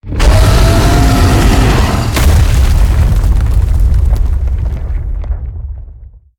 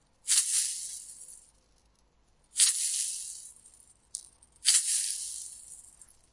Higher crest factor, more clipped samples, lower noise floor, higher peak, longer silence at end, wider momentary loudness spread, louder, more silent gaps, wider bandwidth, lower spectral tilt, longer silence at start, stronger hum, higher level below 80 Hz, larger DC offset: second, 8 dB vs 26 dB; neither; second, -33 dBFS vs -67 dBFS; first, 0 dBFS vs -6 dBFS; second, 0.3 s vs 0.5 s; second, 12 LU vs 23 LU; first, -11 LUFS vs -26 LUFS; neither; first, 17.5 kHz vs 11.5 kHz; first, -5.5 dB/octave vs 5 dB/octave; second, 0.05 s vs 0.25 s; neither; first, -10 dBFS vs -72 dBFS; neither